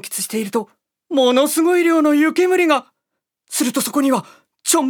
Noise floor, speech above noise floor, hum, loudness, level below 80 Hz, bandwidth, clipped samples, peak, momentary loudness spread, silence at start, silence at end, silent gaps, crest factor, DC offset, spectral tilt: -79 dBFS; 63 dB; none; -17 LUFS; -74 dBFS; 20 kHz; under 0.1%; -2 dBFS; 10 LU; 0.05 s; 0 s; none; 16 dB; under 0.1%; -2.5 dB/octave